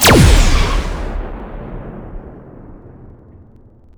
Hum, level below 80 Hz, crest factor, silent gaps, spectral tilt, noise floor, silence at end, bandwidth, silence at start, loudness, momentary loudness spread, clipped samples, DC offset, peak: none; -18 dBFS; 16 dB; none; -4.5 dB/octave; -43 dBFS; 1.1 s; over 20 kHz; 0 s; -14 LUFS; 28 LU; under 0.1%; under 0.1%; 0 dBFS